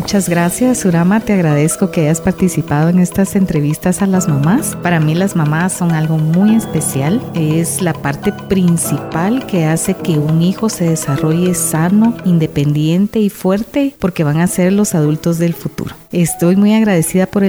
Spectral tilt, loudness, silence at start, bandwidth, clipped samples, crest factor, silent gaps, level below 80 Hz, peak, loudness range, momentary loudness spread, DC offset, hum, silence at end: -6 dB/octave; -14 LUFS; 0 s; over 20 kHz; under 0.1%; 10 dB; none; -42 dBFS; -2 dBFS; 2 LU; 4 LU; under 0.1%; none; 0 s